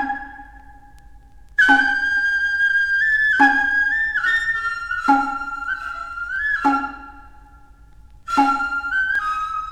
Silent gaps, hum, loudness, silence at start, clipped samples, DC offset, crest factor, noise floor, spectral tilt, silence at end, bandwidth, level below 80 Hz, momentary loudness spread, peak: none; none; -18 LUFS; 0 s; under 0.1%; under 0.1%; 18 dB; -46 dBFS; -3 dB/octave; 0 s; 13 kHz; -46 dBFS; 12 LU; -2 dBFS